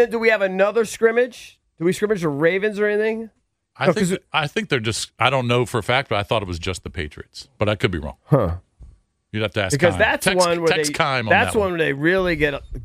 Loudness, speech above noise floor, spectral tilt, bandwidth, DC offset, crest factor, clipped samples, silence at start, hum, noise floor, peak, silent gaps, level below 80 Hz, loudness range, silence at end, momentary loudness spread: -20 LUFS; 29 dB; -4.5 dB/octave; 15.5 kHz; under 0.1%; 18 dB; under 0.1%; 0 s; none; -49 dBFS; -2 dBFS; none; -42 dBFS; 5 LU; 0 s; 11 LU